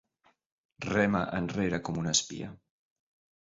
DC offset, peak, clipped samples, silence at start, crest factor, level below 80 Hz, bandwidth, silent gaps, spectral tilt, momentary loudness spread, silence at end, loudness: under 0.1%; -12 dBFS; under 0.1%; 0.8 s; 22 dB; -56 dBFS; 8 kHz; none; -4 dB/octave; 14 LU; 0.85 s; -30 LUFS